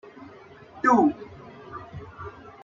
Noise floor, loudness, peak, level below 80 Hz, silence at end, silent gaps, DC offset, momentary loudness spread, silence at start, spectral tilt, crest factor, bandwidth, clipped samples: -48 dBFS; -22 LUFS; -8 dBFS; -60 dBFS; 0.35 s; none; under 0.1%; 26 LU; 0.2 s; -7 dB/octave; 20 dB; 7.6 kHz; under 0.1%